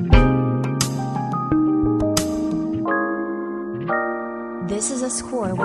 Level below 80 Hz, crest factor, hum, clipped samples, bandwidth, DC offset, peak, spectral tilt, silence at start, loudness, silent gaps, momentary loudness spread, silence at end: -28 dBFS; 20 dB; none; under 0.1%; 14 kHz; under 0.1%; -2 dBFS; -5.5 dB/octave; 0 s; -22 LUFS; none; 9 LU; 0 s